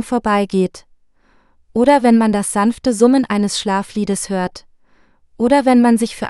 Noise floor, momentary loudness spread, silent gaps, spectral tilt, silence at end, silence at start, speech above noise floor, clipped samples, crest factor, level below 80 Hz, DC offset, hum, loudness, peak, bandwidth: -54 dBFS; 9 LU; none; -5 dB/octave; 0 s; 0 s; 39 dB; under 0.1%; 16 dB; -48 dBFS; under 0.1%; none; -15 LUFS; 0 dBFS; 12.5 kHz